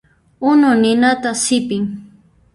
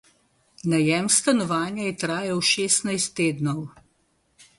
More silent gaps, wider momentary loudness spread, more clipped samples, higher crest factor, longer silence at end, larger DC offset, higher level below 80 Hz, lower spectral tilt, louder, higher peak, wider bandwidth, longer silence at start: neither; about the same, 11 LU vs 9 LU; neither; second, 14 dB vs 20 dB; second, 0.5 s vs 0.9 s; neither; first, -56 dBFS vs -64 dBFS; about the same, -4 dB/octave vs -3.5 dB/octave; first, -15 LUFS vs -23 LUFS; about the same, -2 dBFS vs -4 dBFS; about the same, 11.5 kHz vs 11.5 kHz; second, 0.4 s vs 0.65 s